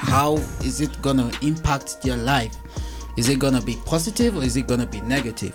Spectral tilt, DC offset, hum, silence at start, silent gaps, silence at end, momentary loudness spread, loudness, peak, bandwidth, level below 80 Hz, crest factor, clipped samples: -5 dB/octave; under 0.1%; none; 0 s; none; 0 s; 7 LU; -22 LUFS; -6 dBFS; 17.5 kHz; -34 dBFS; 16 dB; under 0.1%